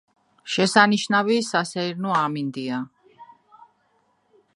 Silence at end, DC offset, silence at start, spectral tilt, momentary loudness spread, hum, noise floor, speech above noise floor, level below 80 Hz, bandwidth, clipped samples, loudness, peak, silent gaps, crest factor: 1.3 s; under 0.1%; 0.45 s; -4 dB/octave; 13 LU; none; -66 dBFS; 44 dB; -72 dBFS; 11.5 kHz; under 0.1%; -22 LUFS; 0 dBFS; none; 24 dB